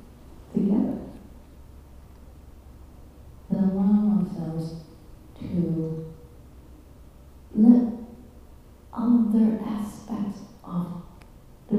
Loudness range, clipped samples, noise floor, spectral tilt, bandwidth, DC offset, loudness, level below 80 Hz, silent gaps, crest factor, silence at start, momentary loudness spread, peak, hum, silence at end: 8 LU; under 0.1%; -48 dBFS; -9.5 dB/octave; 11.5 kHz; under 0.1%; -25 LUFS; -50 dBFS; none; 22 dB; 0.1 s; 21 LU; -4 dBFS; none; 0 s